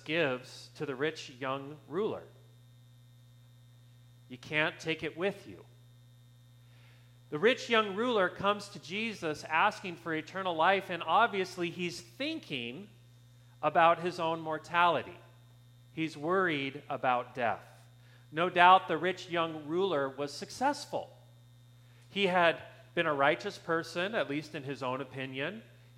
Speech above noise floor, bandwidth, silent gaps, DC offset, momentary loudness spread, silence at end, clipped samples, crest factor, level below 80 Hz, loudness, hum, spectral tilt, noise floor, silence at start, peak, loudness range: 26 dB; 15.5 kHz; none; under 0.1%; 14 LU; 0.35 s; under 0.1%; 26 dB; -74 dBFS; -32 LUFS; 60 Hz at -60 dBFS; -4.5 dB/octave; -58 dBFS; 0.05 s; -8 dBFS; 8 LU